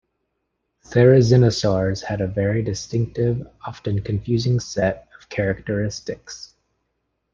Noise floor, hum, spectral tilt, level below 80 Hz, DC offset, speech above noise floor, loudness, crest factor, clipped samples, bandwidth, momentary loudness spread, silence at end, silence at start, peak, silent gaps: -75 dBFS; none; -6.5 dB/octave; -46 dBFS; under 0.1%; 55 dB; -20 LUFS; 18 dB; under 0.1%; 7.6 kHz; 17 LU; 0.9 s; 0.9 s; -2 dBFS; none